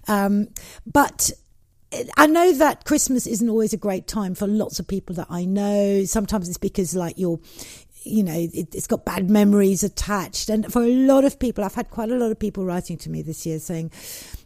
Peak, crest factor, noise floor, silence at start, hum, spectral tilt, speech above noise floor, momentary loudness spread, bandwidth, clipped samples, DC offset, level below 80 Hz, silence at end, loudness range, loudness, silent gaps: 0 dBFS; 22 dB; -55 dBFS; 0.05 s; none; -5 dB/octave; 34 dB; 14 LU; 15.5 kHz; under 0.1%; under 0.1%; -42 dBFS; 0.1 s; 5 LU; -21 LUFS; none